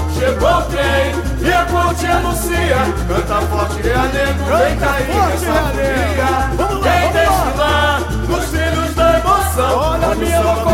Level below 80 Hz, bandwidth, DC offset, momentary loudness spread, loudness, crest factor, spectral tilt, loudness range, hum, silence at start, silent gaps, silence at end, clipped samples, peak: -22 dBFS; 17 kHz; under 0.1%; 4 LU; -15 LUFS; 14 dB; -5 dB/octave; 1 LU; none; 0 s; none; 0 s; under 0.1%; -2 dBFS